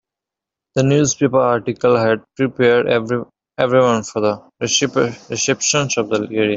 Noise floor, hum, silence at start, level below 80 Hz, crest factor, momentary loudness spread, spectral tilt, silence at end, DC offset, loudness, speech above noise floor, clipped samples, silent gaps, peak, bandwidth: -86 dBFS; none; 0.75 s; -56 dBFS; 16 dB; 7 LU; -4 dB/octave; 0 s; under 0.1%; -17 LUFS; 69 dB; under 0.1%; none; 0 dBFS; 8 kHz